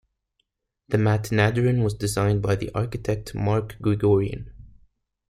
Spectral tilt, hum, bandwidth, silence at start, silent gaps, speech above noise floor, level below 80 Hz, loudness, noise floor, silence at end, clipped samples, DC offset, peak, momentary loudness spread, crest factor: -7 dB/octave; none; 14.5 kHz; 0.9 s; none; 53 dB; -46 dBFS; -23 LUFS; -75 dBFS; 0.6 s; under 0.1%; under 0.1%; -4 dBFS; 8 LU; 20 dB